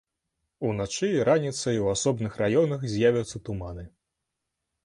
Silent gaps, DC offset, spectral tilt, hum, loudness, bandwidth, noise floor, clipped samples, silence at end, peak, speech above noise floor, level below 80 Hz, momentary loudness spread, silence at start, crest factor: none; under 0.1%; -5.5 dB/octave; none; -26 LUFS; 11 kHz; -83 dBFS; under 0.1%; 0.95 s; -8 dBFS; 58 dB; -52 dBFS; 12 LU; 0.6 s; 18 dB